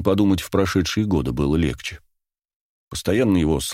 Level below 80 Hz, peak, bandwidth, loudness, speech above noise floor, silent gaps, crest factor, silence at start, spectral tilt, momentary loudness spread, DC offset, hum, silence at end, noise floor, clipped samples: -36 dBFS; -4 dBFS; 16.5 kHz; -21 LUFS; 55 dB; 2.56-2.87 s; 18 dB; 0 s; -6 dB/octave; 11 LU; under 0.1%; none; 0 s; -75 dBFS; under 0.1%